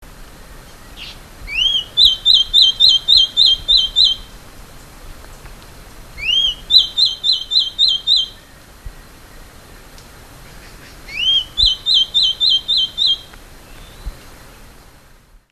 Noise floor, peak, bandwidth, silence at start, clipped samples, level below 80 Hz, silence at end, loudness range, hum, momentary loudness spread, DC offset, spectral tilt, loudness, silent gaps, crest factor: -46 dBFS; 0 dBFS; 14 kHz; 0 s; under 0.1%; -38 dBFS; 1.25 s; 9 LU; none; 15 LU; under 0.1%; 0 dB/octave; -12 LUFS; none; 18 dB